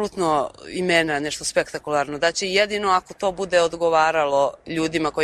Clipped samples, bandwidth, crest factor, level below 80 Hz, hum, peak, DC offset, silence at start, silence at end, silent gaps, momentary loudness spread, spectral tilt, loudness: under 0.1%; 13.5 kHz; 16 dB; -54 dBFS; none; -4 dBFS; under 0.1%; 0 s; 0 s; none; 6 LU; -3.5 dB/octave; -21 LUFS